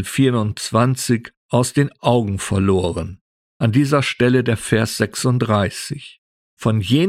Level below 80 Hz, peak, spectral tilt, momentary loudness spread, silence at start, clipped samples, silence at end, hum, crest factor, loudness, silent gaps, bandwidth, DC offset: -46 dBFS; -2 dBFS; -5.5 dB/octave; 8 LU; 0 s; under 0.1%; 0 s; none; 16 dB; -18 LUFS; 1.37-1.49 s, 3.21-3.60 s, 6.18-6.57 s; 15 kHz; under 0.1%